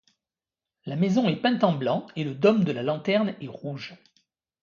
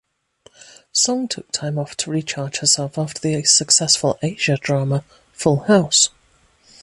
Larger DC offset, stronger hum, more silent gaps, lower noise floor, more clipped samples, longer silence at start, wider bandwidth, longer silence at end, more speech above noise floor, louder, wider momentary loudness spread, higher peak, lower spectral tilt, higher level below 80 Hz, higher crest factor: neither; neither; neither; first, under -90 dBFS vs -57 dBFS; neither; about the same, 0.85 s vs 0.95 s; second, 7.2 kHz vs 11.5 kHz; about the same, 0.7 s vs 0.75 s; first, over 65 dB vs 38 dB; second, -25 LUFS vs -18 LUFS; first, 14 LU vs 11 LU; second, -6 dBFS vs 0 dBFS; first, -7.5 dB/octave vs -3 dB/octave; second, -70 dBFS vs -58 dBFS; about the same, 20 dB vs 20 dB